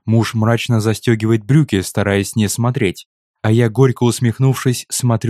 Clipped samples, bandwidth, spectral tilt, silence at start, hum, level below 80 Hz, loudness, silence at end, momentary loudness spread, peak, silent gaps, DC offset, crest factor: under 0.1%; 14.5 kHz; -6 dB/octave; 0.05 s; none; -52 dBFS; -16 LUFS; 0 s; 4 LU; 0 dBFS; 3.06-3.34 s; under 0.1%; 16 dB